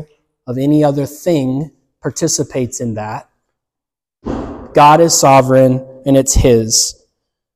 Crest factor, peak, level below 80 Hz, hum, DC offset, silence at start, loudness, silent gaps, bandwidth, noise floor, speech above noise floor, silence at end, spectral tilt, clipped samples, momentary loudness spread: 14 dB; 0 dBFS; -30 dBFS; none; under 0.1%; 0 s; -12 LUFS; none; 15.5 kHz; -86 dBFS; 74 dB; 0.65 s; -4.5 dB/octave; under 0.1%; 17 LU